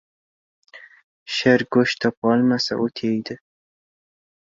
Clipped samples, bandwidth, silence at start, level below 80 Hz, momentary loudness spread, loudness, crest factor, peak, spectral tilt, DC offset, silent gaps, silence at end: under 0.1%; 7.6 kHz; 0.75 s; -62 dBFS; 10 LU; -20 LUFS; 20 dB; -2 dBFS; -5.5 dB/octave; under 0.1%; 1.04-1.26 s, 2.17-2.22 s; 1.25 s